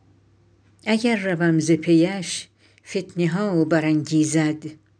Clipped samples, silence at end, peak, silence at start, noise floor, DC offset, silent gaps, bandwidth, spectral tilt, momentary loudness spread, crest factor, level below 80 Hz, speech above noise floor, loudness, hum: under 0.1%; 0.25 s; -6 dBFS; 0.85 s; -57 dBFS; under 0.1%; none; 10.5 kHz; -5.5 dB/octave; 11 LU; 14 dB; -68 dBFS; 37 dB; -21 LUFS; none